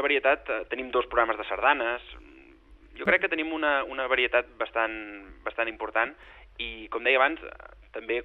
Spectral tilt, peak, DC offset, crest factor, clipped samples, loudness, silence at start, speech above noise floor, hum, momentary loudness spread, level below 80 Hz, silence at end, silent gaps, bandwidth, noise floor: -6 dB/octave; -6 dBFS; under 0.1%; 22 dB; under 0.1%; -27 LUFS; 0 s; 26 dB; none; 15 LU; -54 dBFS; 0 s; none; 4.7 kHz; -53 dBFS